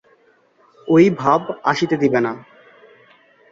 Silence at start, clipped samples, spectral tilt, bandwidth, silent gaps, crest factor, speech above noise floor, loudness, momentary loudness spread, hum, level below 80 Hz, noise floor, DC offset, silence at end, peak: 0.85 s; under 0.1%; -6.5 dB/octave; 7.6 kHz; none; 18 dB; 40 dB; -17 LUFS; 13 LU; none; -60 dBFS; -56 dBFS; under 0.1%; 1.1 s; -2 dBFS